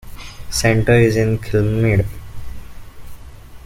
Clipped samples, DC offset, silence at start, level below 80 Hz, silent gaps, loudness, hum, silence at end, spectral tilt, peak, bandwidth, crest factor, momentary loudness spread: under 0.1%; under 0.1%; 0.05 s; -32 dBFS; none; -16 LUFS; none; 0.05 s; -6 dB/octave; -2 dBFS; 16 kHz; 16 dB; 23 LU